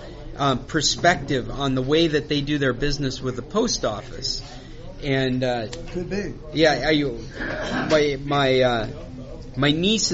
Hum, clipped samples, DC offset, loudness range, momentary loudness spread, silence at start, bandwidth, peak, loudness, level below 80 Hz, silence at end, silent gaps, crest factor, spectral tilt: none; under 0.1%; under 0.1%; 4 LU; 13 LU; 0 s; 8 kHz; -4 dBFS; -22 LUFS; -38 dBFS; 0 s; none; 20 dB; -3.5 dB/octave